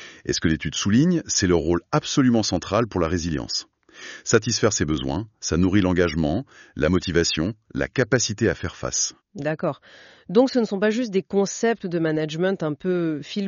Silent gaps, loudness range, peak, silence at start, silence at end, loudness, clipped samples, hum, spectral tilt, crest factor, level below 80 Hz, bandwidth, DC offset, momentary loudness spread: none; 2 LU; -2 dBFS; 0 s; 0 s; -23 LUFS; under 0.1%; none; -5 dB/octave; 20 dB; -44 dBFS; 7.4 kHz; under 0.1%; 9 LU